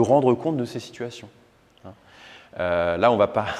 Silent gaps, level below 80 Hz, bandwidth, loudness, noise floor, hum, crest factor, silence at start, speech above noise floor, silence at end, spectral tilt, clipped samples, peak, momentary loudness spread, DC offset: none; -56 dBFS; 11.5 kHz; -22 LUFS; -48 dBFS; none; 20 dB; 0 s; 26 dB; 0 s; -6.5 dB/octave; under 0.1%; -4 dBFS; 16 LU; under 0.1%